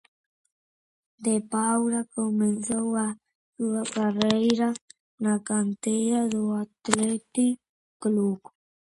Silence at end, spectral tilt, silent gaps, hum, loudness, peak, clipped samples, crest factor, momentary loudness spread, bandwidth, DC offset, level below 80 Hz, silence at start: 0.65 s; -4.5 dB/octave; 3.35-3.53 s, 4.81-4.88 s, 5.00-5.18 s, 7.69-8.00 s; none; -26 LUFS; 0 dBFS; under 0.1%; 26 dB; 8 LU; 11.5 kHz; under 0.1%; -68 dBFS; 1.2 s